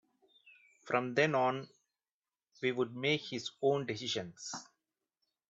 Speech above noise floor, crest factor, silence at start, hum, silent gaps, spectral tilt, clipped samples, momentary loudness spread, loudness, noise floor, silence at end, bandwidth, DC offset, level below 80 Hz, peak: over 56 dB; 22 dB; 0.45 s; none; 2.13-2.21 s; -4.5 dB/octave; under 0.1%; 13 LU; -35 LUFS; under -90 dBFS; 0.9 s; 8 kHz; under 0.1%; -80 dBFS; -14 dBFS